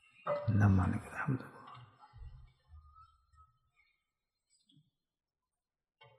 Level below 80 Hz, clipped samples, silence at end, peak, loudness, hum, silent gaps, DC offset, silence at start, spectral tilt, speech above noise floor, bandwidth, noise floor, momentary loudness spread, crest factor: -60 dBFS; under 0.1%; 3.4 s; -18 dBFS; -34 LUFS; none; none; under 0.1%; 0.25 s; -9 dB/octave; over 58 dB; 10.5 kHz; under -90 dBFS; 27 LU; 22 dB